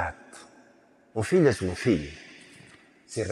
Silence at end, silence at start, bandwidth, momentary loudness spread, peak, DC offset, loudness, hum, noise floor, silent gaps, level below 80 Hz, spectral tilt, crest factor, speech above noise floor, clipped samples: 0 s; 0 s; 12.5 kHz; 26 LU; -8 dBFS; under 0.1%; -26 LUFS; none; -59 dBFS; none; -56 dBFS; -6 dB/octave; 20 dB; 34 dB; under 0.1%